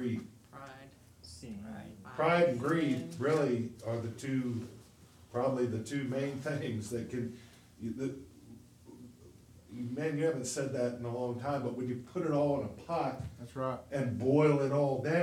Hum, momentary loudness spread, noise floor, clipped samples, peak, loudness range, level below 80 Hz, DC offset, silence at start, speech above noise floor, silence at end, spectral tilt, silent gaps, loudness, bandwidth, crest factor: none; 21 LU; -58 dBFS; under 0.1%; -14 dBFS; 7 LU; -70 dBFS; under 0.1%; 0 s; 25 dB; 0 s; -6.5 dB/octave; none; -34 LUFS; 16 kHz; 20 dB